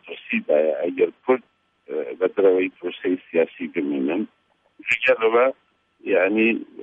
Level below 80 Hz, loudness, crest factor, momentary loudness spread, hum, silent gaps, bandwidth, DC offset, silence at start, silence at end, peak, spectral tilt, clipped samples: -72 dBFS; -22 LUFS; 16 dB; 11 LU; none; none; 8 kHz; under 0.1%; 0.05 s; 0 s; -6 dBFS; -6 dB/octave; under 0.1%